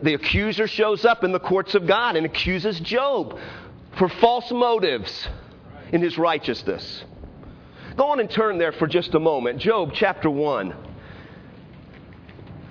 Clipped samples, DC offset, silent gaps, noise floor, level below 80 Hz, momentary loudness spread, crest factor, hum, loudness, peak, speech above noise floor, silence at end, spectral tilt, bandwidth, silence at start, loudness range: under 0.1%; under 0.1%; none; -44 dBFS; -46 dBFS; 22 LU; 20 dB; none; -22 LUFS; -2 dBFS; 22 dB; 0 s; -6.5 dB/octave; 5.4 kHz; 0 s; 4 LU